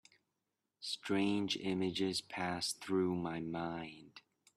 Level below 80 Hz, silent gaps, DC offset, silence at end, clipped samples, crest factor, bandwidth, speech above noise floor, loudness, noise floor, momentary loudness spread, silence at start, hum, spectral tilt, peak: -74 dBFS; none; under 0.1%; 0.4 s; under 0.1%; 16 dB; 13.5 kHz; 50 dB; -38 LUFS; -88 dBFS; 10 LU; 0.8 s; none; -4.5 dB/octave; -22 dBFS